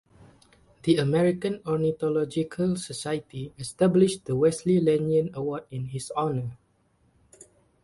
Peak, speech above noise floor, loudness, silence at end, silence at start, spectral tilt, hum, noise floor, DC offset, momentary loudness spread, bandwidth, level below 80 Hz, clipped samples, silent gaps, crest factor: -8 dBFS; 41 dB; -26 LUFS; 0.4 s; 0.85 s; -6.5 dB/octave; none; -66 dBFS; under 0.1%; 11 LU; 11.5 kHz; -60 dBFS; under 0.1%; none; 18 dB